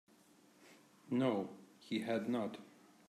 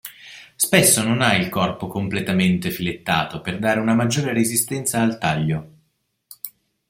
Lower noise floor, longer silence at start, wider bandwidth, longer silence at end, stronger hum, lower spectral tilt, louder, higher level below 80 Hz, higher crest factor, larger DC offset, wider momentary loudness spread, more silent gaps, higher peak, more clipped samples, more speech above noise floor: about the same, -67 dBFS vs -69 dBFS; first, 0.6 s vs 0.05 s; second, 13.5 kHz vs 16.5 kHz; about the same, 0.4 s vs 0.4 s; neither; first, -6.5 dB/octave vs -4 dB/octave; second, -39 LUFS vs -20 LUFS; second, -88 dBFS vs -54 dBFS; about the same, 18 dB vs 20 dB; neither; second, 15 LU vs 20 LU; neither; second, -24 dBFS vs 0 dBFS; neither; second, 29 dB vs 49 dB